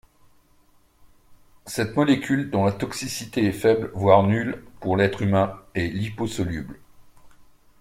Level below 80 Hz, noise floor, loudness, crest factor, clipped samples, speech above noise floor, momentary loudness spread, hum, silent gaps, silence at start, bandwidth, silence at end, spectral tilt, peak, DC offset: -52 dBFS; -58 dBFS; -23 LUFS; 22 dB; under 0.1%; 36 dB; 12 LU; none; none; 1.3 s; 16 kHz; 0.4 s; -6 dB/octave; -2 dBFS; under 0.1%